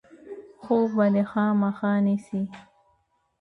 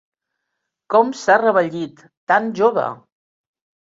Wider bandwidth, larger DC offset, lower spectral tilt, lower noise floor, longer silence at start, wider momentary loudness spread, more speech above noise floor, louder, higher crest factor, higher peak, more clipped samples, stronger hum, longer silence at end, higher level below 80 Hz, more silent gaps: second, 4.8 kHz vs 7.8 kHz; neither; first, -9 dB/octave vs -5 dB/octave; second, -69 dBFS vs -78 dBFS; second, 0.25 s vs 0.9 s; first, 21 LU vs 14 LU; second, 46 dB vs 61 dB; second, -24 LUFS vs -17 LUFS; about the same, 16 dB vs 18 dB; second, -10 dBFS vs -2 dBFS; neither; neither; about the same, 0.8 s vs 0.85 s; about the same, -68 dBFS vs -68 dBFS; second, none vs 2.17-2.27 s